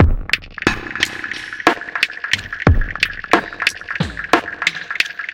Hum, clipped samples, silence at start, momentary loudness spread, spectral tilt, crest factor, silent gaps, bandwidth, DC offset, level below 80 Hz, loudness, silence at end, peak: none; under 0.1%; 0 s; 5 LU; -4.5 dB/octave; 18 dB; none; 17 kHz; under 0.1%; -26 dBFS; -19 LUFS; 0 s; 0 dBFS